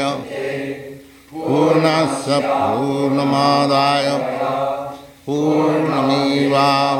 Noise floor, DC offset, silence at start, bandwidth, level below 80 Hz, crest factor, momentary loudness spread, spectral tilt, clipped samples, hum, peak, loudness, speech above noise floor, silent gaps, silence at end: -37 dBFS; under 0.1%; 0 s; 16 kHz; -58 dBFS; 14 dB; 13 LU; -5.5 dB/octave; under 0.1%; none; -4 dBFS; -17 LUFS; 21 dB; none; 0 s